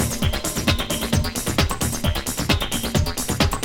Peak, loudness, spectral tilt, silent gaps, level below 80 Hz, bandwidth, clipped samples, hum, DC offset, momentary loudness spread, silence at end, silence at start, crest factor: -4 dBFS; -22 LUFS; -4 dB/octave; none; -30 dBFS; 19 kHz; under 0.1%; none; under 0.1%; 2 LU; 0 s; 0 s; 18 dB